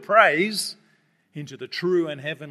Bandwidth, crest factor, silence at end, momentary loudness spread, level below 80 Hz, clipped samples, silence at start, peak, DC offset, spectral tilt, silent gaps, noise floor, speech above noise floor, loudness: 14 kHz; 22 dB; 0 s; 22 LU; -80 dBFS; under 0.1%; 0 s; 0 dBFS; under 0.1%; -4 dB/octave; none; -64 dBFS; 41 dB; -22 LUFS